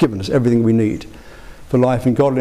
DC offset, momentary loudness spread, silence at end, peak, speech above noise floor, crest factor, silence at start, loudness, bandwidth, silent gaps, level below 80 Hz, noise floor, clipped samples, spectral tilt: 0.6%; 6 LU; 0 s; -6 dBFS; 22 dB; 10 dB; 0 s; -16 LUFS; 13 kHz; none; -42 dBFS; -37 dBFS; under 0.1%; -8 dB/octave